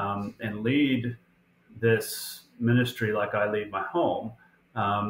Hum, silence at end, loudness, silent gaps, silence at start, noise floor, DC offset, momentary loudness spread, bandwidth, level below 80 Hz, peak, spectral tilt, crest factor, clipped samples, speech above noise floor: none; 0 s; -28 LUFS; none; 0 s; -59 dBFS; under 0.1%; 12 LU; 16 kHz; -64 dBFS; -12 dBFS; -6 dB/octave; 16 dB; under 0.1%; 32 dB